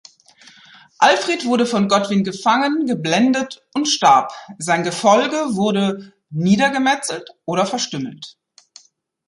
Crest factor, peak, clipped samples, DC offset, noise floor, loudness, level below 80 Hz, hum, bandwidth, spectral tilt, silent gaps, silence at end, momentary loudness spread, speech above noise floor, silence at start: 18 dB; -2 dBFS; under 0.1%; under 0.1%; -56 dBFS; -17 LUFS; -64 dBFS; none; 11.5 kHz; -4 dB/octave; none; 0.95 s; 13 LU; 39 dB; 1 s